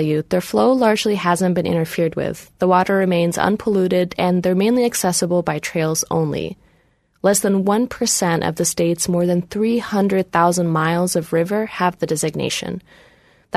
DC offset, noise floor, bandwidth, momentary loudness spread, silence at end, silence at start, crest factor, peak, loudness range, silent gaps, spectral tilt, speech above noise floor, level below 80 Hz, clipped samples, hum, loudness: under 0.1%; -59 dBFS; 13.5 kHz; 5 LU; 0 s; 0 s; 18 dB; -2 dBFS; 2 LU; none; -5 dB/octave; 41 dB; -52 dBFS; under 0.1%; none; -18 LUFS